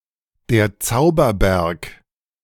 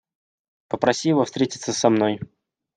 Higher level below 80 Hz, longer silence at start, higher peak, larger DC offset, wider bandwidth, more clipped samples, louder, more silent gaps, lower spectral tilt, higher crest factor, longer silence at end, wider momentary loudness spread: first, -32 dBFS vs -64 dBFS; second, 0.5 s vs 0.7 s; about the same, -4 dBFS vs -2 dBFS; neither; first, 18 kHz vs 10 kHz; neither; first, -18 LUFS vs -21 LUFS; neither; about the same, -5.5 dB/octave vs -4.5 dB/octave; about the same, 16 dB vs 20 dB; about the same, 0.5 s vs 0.5 s; about the same, 12 LU vs 13 LU